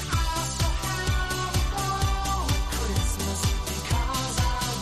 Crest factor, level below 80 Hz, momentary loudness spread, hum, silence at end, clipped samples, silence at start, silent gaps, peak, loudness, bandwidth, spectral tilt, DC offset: 14 dB; -30 dBFS; 1 LU; none; 0 s; under 0.1%; 0 s; none; -12 dBFS; -27 LUFS; 14 kHz; -3.5 dB/octave; 0.4%